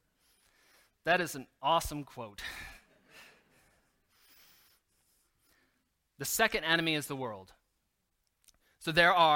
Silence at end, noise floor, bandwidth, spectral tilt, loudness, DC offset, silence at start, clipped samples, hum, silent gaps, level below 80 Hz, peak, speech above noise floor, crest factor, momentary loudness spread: 0 s; -80 dBFS; 17 kHz; -3 dB/octave; -31 LUFS; under 0.1%; 1.05 s; under 0.1%; none; none; -60 dBFS; -10 dBFS; 50 dB; 24 dB; 17 LU